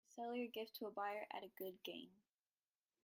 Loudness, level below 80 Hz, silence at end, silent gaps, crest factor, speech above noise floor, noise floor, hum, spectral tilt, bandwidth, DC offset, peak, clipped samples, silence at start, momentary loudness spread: -49 LUFS; under -90 dBFS; 0.9 s; none; 18 dB; over 40 dB; under -90 dBFS; none; -4 dB/octave; 16 kHz; under 0.1%; -34 dBFS; under 0.1%; 0.1 s; 7 LU